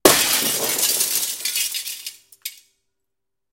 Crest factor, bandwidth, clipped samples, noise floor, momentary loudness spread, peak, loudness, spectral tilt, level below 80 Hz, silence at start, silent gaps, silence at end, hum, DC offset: 22 dB; 17 kHz; under 0.1%; -84 dBFS; 18 LU; 0 dBFS; -19 LUFS; -0.5 dB/octave; -54 dBFS; 0.05 s; none; 1 s; none; under 0.1%